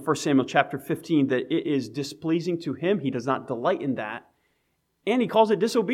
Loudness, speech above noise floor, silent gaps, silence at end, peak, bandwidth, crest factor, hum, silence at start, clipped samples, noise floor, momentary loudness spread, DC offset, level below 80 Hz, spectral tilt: -25 LUFS; 48 dB; none; 0 s; -4 dBFS; 15 kHz; 22 dB; none; 0 s; under 0.1%; -73 dBFS; 10 LU; under 0.1%; -72 dBFS; -5.5 dB/octave